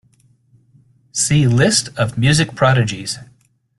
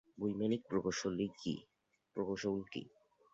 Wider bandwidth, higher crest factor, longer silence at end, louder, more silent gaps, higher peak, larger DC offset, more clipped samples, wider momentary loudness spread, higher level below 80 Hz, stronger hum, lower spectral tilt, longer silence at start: first, 12.5 kHz vs 7.8 kHz; about the same, 16 dB vs 18 dB; about the same, 0.55 s vs 0.45 s; first, -16 LUFS vs -40 LUFS; neither; first, -2 dBFS vs -22 dBFS; neither; neither; about the same, 12 LU vs 12 LU; first, -46 dBFS vs -70 dBFS; neither; about the same, -4.5 dB/octave vs -5.5 dB/octave; first, 1.15 s vs 0.15 s